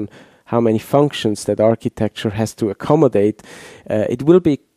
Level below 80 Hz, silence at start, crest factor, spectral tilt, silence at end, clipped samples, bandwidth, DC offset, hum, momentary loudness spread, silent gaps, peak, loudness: -50 dBFS; 0 s; 16 dB; -7 dB/octave; 0.2 s; under 0.1%; 15 kHz; under 0.1%; none; 10 LU; none; 0 dBFS; -17 LUFS